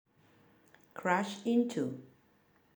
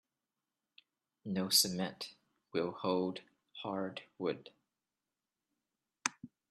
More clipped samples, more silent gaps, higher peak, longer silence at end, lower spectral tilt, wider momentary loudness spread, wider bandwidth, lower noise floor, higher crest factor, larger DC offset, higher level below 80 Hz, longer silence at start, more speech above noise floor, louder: neither; neither; second, -14 dBFS vs -10 dBFS; first, 0.7 s vs 0.25 s; first, -5.5 dB/octave vs -3 dB/octave; second, 15 LU vs 19 LU; first, over 20 kHz vs 13 kHz; second, -68 dBFS vs under -90 dBFS; second, 22 dB vs 30 dB; neither; about the same, -84 dBFS vs -80 dBFS; second, 0.95 s vs 1.25 s; second, 36 dB vs over 54 dB; first, -33 LUFS vs -36 LUFS